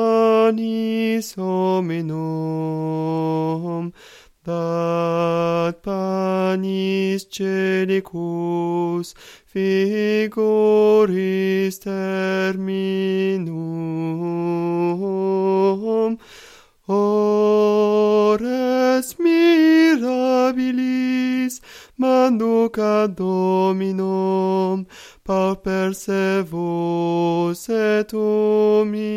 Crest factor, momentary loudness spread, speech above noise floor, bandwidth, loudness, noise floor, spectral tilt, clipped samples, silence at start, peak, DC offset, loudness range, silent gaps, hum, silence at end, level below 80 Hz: 16 dB; 9 LU; 27 dB; 15.5 kHz; -20 LUFS; -47 dBFS; -6.5 dB/octave; under 0.1%; 0 s; -4 dBFS; under 0.1%; 6 LU; none; none; 0 s; -58 dBFS